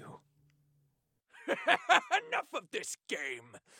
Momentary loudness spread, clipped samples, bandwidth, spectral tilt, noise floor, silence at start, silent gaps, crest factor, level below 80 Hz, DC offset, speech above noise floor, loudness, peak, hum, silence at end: 13 LU; under 0.1%; 17.5 kHz; -1.5 dB/octave; -77 dBFS; 0 s; none; 26 dB; -90 dBFS; under 0.1%; 44 dB; -32 LUFS; -10 dBFS; none; 0.2 s